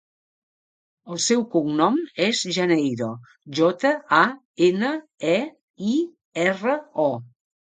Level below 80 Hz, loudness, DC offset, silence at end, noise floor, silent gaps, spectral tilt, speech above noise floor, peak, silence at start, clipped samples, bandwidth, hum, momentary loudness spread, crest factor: -72 dBFS; -22 LUFS; under 0.1%; 0.55 s; under -90 dBFS; 4.45-4.54 s, 5.61-5.74 s, 6.25-6.32 s; -4 dB/octave; over 68 dB; -2 dBFS; 1.05 s; under 0.1%; 9.4 kHz; none; 11 LU; 20 dB